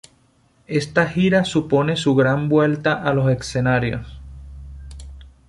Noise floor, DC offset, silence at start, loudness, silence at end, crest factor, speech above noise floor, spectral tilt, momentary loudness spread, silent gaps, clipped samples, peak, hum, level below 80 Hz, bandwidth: -58 dBFS; under 0.1%; 0.7 s; -19 LUFS; 0.2 s; 16 dB; 40 dB; -6.5 dB/octave; 22 LU; none; under 0.1%; -4 dBFS; none; -42 dBFS; 11.5 kHz